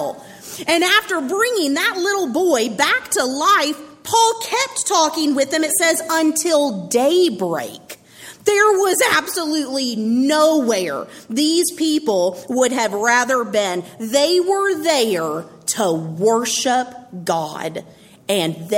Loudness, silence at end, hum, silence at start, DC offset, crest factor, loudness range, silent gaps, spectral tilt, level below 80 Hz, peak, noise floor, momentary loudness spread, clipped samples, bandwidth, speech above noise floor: -17 LUFS; 0 s; none; 0 s; under 0.1%; 16 dB; 2 LU; none; -2.5 dB/octave; -64 dBFS; -2 dBFS; -41 dBFS; 11 LU; under 0.1%; 16.5 kHz; 23 dB